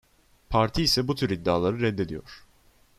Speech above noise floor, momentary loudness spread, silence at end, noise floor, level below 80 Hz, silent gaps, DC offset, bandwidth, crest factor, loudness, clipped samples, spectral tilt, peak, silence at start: 34 dB; 9 LU; 0.6 s; -60 dBFS; -44 dBFS; none; under 0.1%; 14 kHz; 20 dB; -25 LUFS; under 0.1%; -5 dB/octave; -8 dBFS; 0.5 s